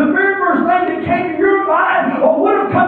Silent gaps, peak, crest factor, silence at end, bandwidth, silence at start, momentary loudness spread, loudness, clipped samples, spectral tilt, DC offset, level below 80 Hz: none; -2 dBFS; 12 dB; 0 s; 4.5 kHz; 0 s; 3 LU; -14 LUFS; under 0.1%; -9 dB/octave; under 0.1%; -54 dBFS